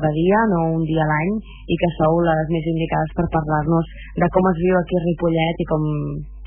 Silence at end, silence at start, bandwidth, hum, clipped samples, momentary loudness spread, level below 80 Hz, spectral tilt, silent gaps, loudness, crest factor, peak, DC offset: 0 s; 0 s; 3.5 kHz; none; under 0.1%; 6 LU; -36 dBFS; -12 dB/octave; none; -20 LUFS; 14 dB; -4 dBFS; under 0.1%